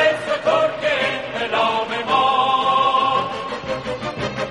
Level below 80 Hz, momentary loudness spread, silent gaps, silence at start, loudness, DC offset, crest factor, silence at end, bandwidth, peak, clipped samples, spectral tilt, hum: -52 dBFS; 9 LU; none; 0 s; -19 LUFS; 0.1%; 14 dB; 0 s; 11.5 kHz; -4 dBFS; under 0.1%; -4 dB/octave; none